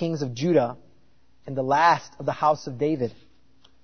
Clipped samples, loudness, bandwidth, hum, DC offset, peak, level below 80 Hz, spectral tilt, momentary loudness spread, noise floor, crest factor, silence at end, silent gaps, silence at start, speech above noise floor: under 0.1%; -24 LUFS; 6.6 kHz; none; 0.3%; -6 dBFS; -62 dBFS; -6 dB/octave; 12 LU; -63 dBFS; 20 dB; 0.75 s; none; 0 s; 40 dB